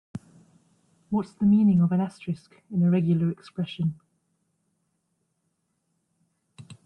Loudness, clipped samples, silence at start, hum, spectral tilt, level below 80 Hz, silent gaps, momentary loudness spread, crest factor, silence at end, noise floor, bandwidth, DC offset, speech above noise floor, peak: -25 LUFS; under 0.1%; 0.15 s; none; -9.5 dB/octave; -62 dBFS; none; 15 LU; 14 dB; 0.15 s; -75 dBFS; 8.8 kHz; under 0.1%; 52 dB; -12 dBFS